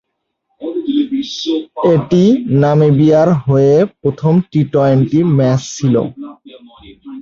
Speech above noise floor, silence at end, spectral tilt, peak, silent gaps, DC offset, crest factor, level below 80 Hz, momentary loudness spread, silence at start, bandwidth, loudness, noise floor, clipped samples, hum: 58 dB; 0 s; -7.5 dB/octave; -2 dBFS; none; under 0.1%; 12 dB; -48 dBFS; 12 LU; 0.6 s; 7.4 kHz; -13 LUFS; -70 dBFS; under 0.1%; none